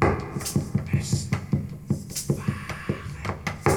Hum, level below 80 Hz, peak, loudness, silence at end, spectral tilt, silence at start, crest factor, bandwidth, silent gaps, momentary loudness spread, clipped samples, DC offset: none; -44 dBFS; -4 dBFS; -28 LUFS; 0 s; -5.5 dB/octave; 0 s; 22 dB; over 20 kHz; none; 6 LU; under 0.1%; under 0.1%